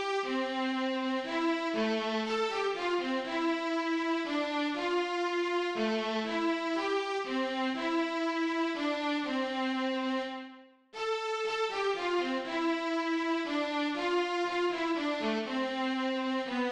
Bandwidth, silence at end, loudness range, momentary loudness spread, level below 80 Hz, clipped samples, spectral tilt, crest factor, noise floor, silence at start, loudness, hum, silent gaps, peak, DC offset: 9.8 kHz; 0 s; 2 LU; 2 LU; -70 dBFS; under 0.1%; -3.5 dB/octave; 12 dB; -52 dBFS; 0 s; -32 LUFS; none; none; -20 dBFS; under 0.1%